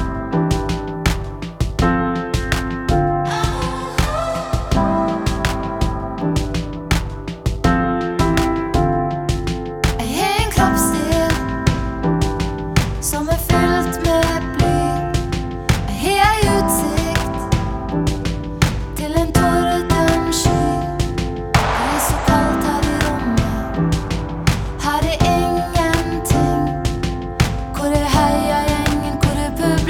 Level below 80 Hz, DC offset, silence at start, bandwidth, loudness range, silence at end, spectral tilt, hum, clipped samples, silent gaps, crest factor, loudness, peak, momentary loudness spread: -26 dBFS; under 0.1%; 0 s; 19.5 kHz; 3 LU; 0 s; -5.5 dB/octave; none; under 0.1%; none; 18 dB; -18 LUFS; 0 dBFS; 6 LU